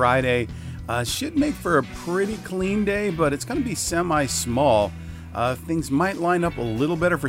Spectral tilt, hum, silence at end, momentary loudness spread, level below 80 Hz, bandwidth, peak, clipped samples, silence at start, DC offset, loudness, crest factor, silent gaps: -5 dB/octave; none; 0 s; 7 LU; -42 dBFS; 16 kHz; -6 dBFS; under 0.1%; 0 s; under 0.1%; -23 LUFS; 18 dB; none